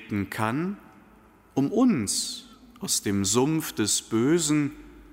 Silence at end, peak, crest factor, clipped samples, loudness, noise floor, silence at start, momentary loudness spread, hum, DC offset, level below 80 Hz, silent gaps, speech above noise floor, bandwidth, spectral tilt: 0.1 s; -10 dBFS; 16 dB; under 0.1%; -25 LUFS; -55 dBFS; 0 s; 10 LU; none; under 0.1%; -58 dBFS; none; 30 dB; 16 kHz; -4 dB/octave